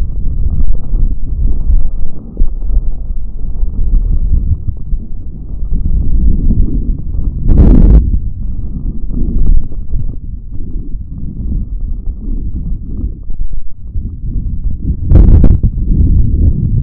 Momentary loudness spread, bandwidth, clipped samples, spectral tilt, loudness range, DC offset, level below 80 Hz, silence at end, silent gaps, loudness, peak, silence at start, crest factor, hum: 16 LU; 1.6 kHz; 2%; -13 dB/octave; 10 LU; under 0.1%; -12 dBFS; 0 s; none; -16 LUFS; 0 dBFS; 0 s; 10 dB; none